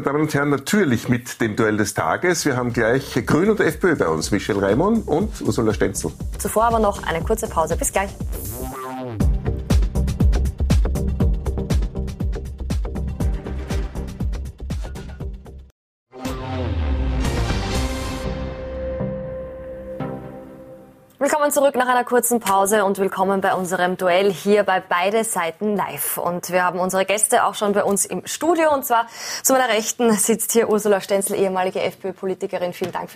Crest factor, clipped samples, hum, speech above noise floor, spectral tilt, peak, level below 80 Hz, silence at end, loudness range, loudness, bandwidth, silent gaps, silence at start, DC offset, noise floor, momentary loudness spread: 18 dB; under 0.1%; none; 25 dB; -4.5 dB/octave; -2 dBFS; -28 dBFS; 0 s; 9 LU; -21 LUFS; 15.5 kHz; 15.71-16.06 s; 0 s; under 0.1%; -44 dBFS; 12 LU